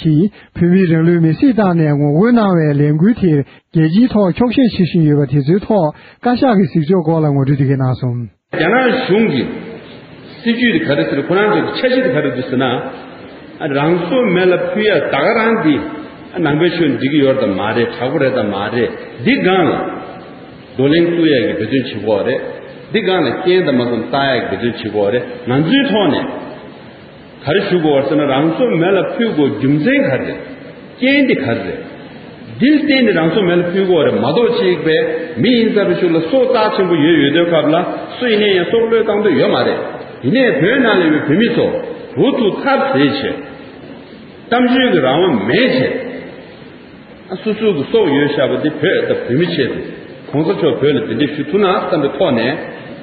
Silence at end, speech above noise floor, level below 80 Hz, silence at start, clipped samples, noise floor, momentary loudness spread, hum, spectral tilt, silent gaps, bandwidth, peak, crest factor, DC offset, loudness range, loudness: 0 s; 23 dB; -50 dBFS; 0 s; under 0.1%; -36 dBFS; 13 LU; none; -5 dB/octave; none; 5 kHz; 0 dBFS; 14 dB; under 0.1%; 3 LU; -14 LUFS